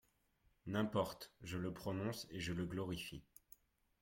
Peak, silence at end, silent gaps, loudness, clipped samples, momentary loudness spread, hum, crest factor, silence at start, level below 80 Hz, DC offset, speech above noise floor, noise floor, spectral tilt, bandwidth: -26 dBFS; 0.8 s; none; -44 LUFS; under 0.1%; 21 LU; none; 20 dB; 0.65 s; -68 dBFS; under 0.1%; 35 dB; -78 dBFS; -5.5 dB/octave; 16.5 kHz